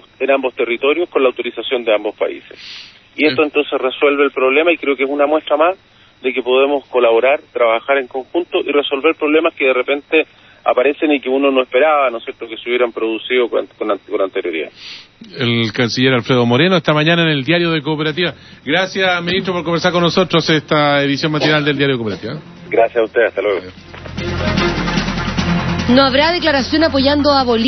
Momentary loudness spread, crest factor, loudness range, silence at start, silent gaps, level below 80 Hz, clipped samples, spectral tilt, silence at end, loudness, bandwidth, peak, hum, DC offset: 10 LU; 16 dB; 3 LU; 0.2 s; none; -40 dBFS; under 0.1%; -5.5 dB/octave; 0 s; -15 LUFS; 6.4 kHz; 0 dBFS; none; under 0.1%